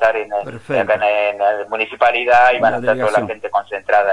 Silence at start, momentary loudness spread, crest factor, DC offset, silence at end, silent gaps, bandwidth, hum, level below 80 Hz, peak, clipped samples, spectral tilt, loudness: 0 s; 10 LU; 14 dB; under 0.1%; 0 s; none; 11.5 kHz; none; -54 dBFS; -2 dBFS; under 0.1%; -5 dB/octave; -16 LUFS